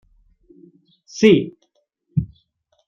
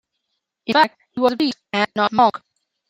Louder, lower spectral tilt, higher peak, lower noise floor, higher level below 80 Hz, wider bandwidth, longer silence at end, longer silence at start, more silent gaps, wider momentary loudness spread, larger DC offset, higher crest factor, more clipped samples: about the same, -18 LUFS vs -19 LUFS; first, -6.5 dB/octave vs -5 dB/octave; about the same, -2 dBFS vs -2 dBFS; second, -67 dBFS vs -76 dBFS; first, -50 dBFS vs -66 dBFS; second, 7.4 kHz vs 16 kHz; first, 0.65 s vs 0.5 s; first, 1.15 s vs 0.7 s; neither; first, 21 LU vs 6 LU; neither; about the same, 20 dB vs 18 dB; neither